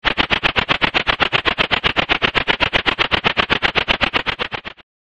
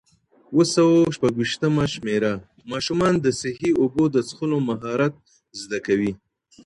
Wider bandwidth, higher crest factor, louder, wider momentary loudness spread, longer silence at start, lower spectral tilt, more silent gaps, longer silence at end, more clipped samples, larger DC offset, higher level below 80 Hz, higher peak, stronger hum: about the same, 10.5 kHz vs 11.5 kHz; about the same, 18 dB vs 16 dB; first, -16 LUFS vs -22 LUFS; second, 5 LU vs 12 LU; second, 0.05 s vs 0.5 s; second, -4 dB/octave vs -5.5 dB/octave; neither; second, 0.35 s vs 0.5 s; neither; neither; first, -36 dBFS vs -54 dBFS; first, 0 dBFS vs -6 dBFS; neither